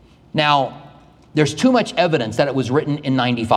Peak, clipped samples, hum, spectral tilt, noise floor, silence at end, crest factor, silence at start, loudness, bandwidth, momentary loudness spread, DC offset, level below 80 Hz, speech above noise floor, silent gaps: -2 dBFS; under 0.1%; none; -5.5 dB/octave; -45 dBFS; 0 s; 18 dB; 0.35 s; -18 LUFS; 12 kHz; 5 LU; under 0.1%; -54 dBFS; 28 dB; none